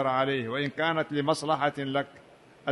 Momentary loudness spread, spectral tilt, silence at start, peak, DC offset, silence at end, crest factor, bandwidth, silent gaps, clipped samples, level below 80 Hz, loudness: 6 LU; -5.5 dB/octave; 0 s; -10 dBFS; under 0.1%; 0 s; 18 dB; 11.5 kHz; none; under 0.1%; -68 dBFS; -28 LUFS